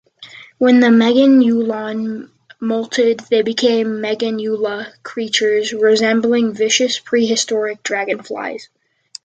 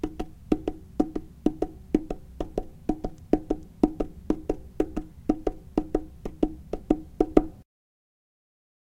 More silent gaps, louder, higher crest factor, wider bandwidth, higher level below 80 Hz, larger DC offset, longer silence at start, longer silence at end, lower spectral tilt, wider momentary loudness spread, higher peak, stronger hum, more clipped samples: neither; first, -16 LUFS vs -30 LUFS; second, 14 dB vs 30 dB; second, 9.2 kHz vs 10.5 kHz; second, -66 dBFS vs -40 dBFS; neither; first, 0.2 s vs 0.05 s; second, 0.6 s vs 1.3 s; second, -3.5 dB/octave vs -8.5 dB/octave; first, 15 LU vs 9 LU; about the same, -2 dBFS vs 0 dBFS; neither; neither